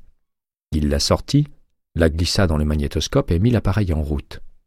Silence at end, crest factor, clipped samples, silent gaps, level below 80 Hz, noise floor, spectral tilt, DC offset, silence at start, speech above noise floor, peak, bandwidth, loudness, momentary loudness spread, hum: 0.15 s; 16 dB; under 0.1%; none; -28 dBFS; -76 dBFS; -5.5 dB/octave; under 0.1%; 0.7 s; 57 dB; -4 dBFS; 15 kHz; -20 LUFS; 9 LU; none